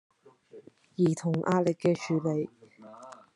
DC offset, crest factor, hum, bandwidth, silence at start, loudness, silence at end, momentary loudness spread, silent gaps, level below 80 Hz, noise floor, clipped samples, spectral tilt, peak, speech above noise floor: under 0.1%; 18 dB; none; 11.5 kHz; 0.55 s; -29 LUFS; 0.2 s; 21 LU; none; -76 dBFS; -54 dBFS; under 0.1%; -7 dB/octave; -14 dBFS; 27 dB